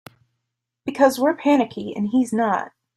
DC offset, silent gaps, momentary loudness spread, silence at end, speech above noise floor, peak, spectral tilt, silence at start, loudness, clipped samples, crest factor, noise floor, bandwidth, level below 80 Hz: under 0.1%; none; 10 LU; 0.3 s; 60 dB; -4 dBFS; -5.5 dB/octave; 0.85 s; -20 LUFS; under 0.1%; 18 dB; -80 dBFS; 14 kHz; -66 dBFS